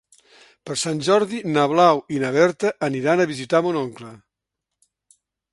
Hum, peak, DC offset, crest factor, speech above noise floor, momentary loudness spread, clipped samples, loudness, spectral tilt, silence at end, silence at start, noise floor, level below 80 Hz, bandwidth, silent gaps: none; -2 dBFS; under 0.1%; 20 dB; 63 dB; 10 LU; under 0.1%; -20 LUFS; -5 dB/octave; 1.35 s; 0.65 s; -83 dBFS; -66 dBFS; 11.5 kHz; none